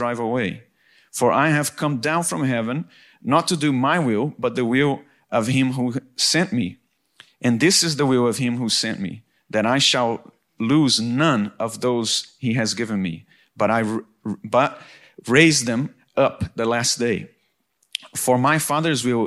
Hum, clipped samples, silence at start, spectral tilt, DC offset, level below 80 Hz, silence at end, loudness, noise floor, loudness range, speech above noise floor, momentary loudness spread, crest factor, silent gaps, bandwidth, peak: none; under 0.1%; 0 s; -4 dB/octave; under 0.1%; -60 dBFS; 0 s; -20 LUFS; -67 dBFS; 2 LU; 47 dB; 12 LU; 20 dB; none; 14.5 kHz; -2 dBFS